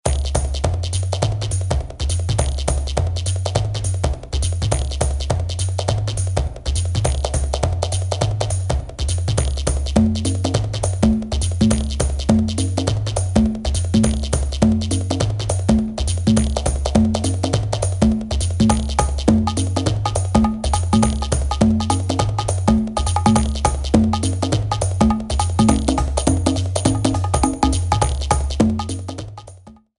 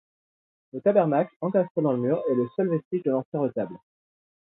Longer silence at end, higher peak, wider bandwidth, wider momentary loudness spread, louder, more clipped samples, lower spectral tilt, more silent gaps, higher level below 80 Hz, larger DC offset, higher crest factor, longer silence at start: second, 0.25 s vs 0.8 s; first, 0 dBFS vs -6 dBFS; first, 11.5 kHz vs 4 kHz; about the same, 5 LU vs 7 LU; first, -19 LUFS vs -25 LUFS; neither; second, -5.5 dB/octave vs -12.5 dB/octave; second, none vs 1.36-1.40 s, 1.70-1.75 s, 2.85-2.91 s, 3.25-3.32 s; first, -24 dBFS vs -74 dBFS; neither; about the same, 18 dB vs 20 dB; second, 0.05 s vs 0.75 s